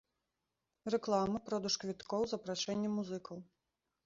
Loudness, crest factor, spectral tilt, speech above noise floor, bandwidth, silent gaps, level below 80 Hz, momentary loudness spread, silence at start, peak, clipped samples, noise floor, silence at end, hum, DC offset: -37 LUFS; 20 dB; -4.5 dB/octave; 51 dB; 7.6 kHz; none; -70 dBFS; 11 LU; 0.85 s; -20 dBFS; under 0.1%; -88 dBFS; 0.6 s; none; under 0.1%